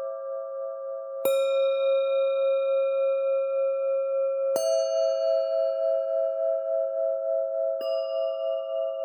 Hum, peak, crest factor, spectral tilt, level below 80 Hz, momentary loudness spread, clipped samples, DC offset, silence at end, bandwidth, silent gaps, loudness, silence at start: none; -12 dBFS; 14 dB; -1 dB/octave; under -90 dBFS; 7 LU; under 0.1%; under 0.1%; 0 s; 18 kHz; none; -26 LUFS; 0 s